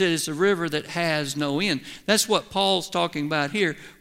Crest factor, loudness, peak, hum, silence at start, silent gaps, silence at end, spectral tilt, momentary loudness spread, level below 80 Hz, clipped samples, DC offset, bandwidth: 18 dB; -24 LUFS; -6 dBFS; none; 0 s; none; 0.1 s; -3.5 dB/octave; 4 LU; -60 dBFS; under 0.1%; under 0.1%; 16 kHz